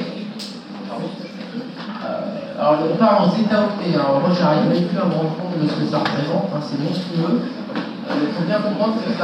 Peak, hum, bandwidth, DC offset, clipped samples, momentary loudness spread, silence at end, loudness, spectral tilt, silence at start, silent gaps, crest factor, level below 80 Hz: -4 dBFS; none; 9.4 kHz; under 0.1%; under 0.1%; 14 LU; 0 s; -20 LUFS; -7.5 dB/octave; 0 s; none; 16 dB; -72 dBFS